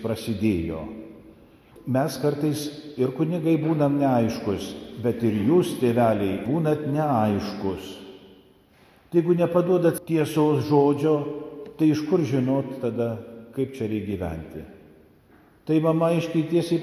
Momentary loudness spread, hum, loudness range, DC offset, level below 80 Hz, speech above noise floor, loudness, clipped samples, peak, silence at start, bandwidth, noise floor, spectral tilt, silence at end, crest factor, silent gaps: 15 LU; none; 5 LU; under 0.1%; -52 dBFS; 33 dB; -24 LUFS; under 0.1%; -6 dBFS; 0 s; 15 kHz; -56 dBFS; -7.5 dB/octave; 0 s; 18 dB; none